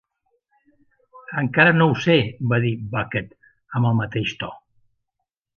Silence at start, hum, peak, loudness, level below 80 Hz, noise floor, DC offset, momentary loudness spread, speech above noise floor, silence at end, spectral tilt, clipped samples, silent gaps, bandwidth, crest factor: 1.15 s; none; 0 dBFS; -20 LUFS; -54 dBFS; -81 dBFS; under 0.1%; 15 LU; 60 dB; 1 s; -7 dB/octave; under 0.1%; none; 7 kHz; 22 dB